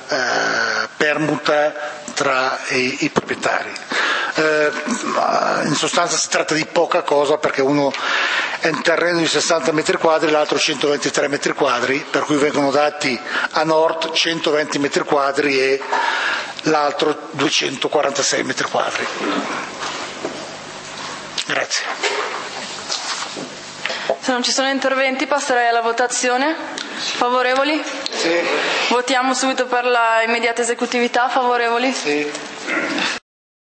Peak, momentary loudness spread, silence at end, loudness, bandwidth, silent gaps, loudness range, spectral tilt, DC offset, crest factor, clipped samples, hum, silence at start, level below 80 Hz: 0 dBFS; 8 LU; 0.55 s; -18 LUFS; 8.8 kHz; none; 5 LU; -2.5 dB/octave; under 0.1%; 18 dB; under 0.1%; none; 0 s; -66 dBFS